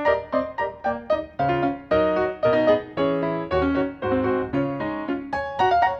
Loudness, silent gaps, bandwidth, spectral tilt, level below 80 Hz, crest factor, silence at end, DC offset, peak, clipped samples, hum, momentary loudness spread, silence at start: -23 LUFS; none; 6.6 kHz; -8 dB/octave; -46 dBFS; 16 dB; 0 s; under 0.1%; -6 dBFS; under 0.1%; none; 7 LU; 0 s